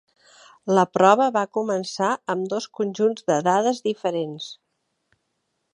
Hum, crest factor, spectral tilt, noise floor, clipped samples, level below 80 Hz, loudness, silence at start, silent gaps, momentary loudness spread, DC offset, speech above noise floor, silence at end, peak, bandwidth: none; 22 dB; -5 dB/octave; -75 dBFS; under 0.1%; -76 dBFS; -22 LUFS; 0.65 s; none; 12 LU; under 0.1%; 53 dB; 1.2 s; -2 dBFS; 11 kHz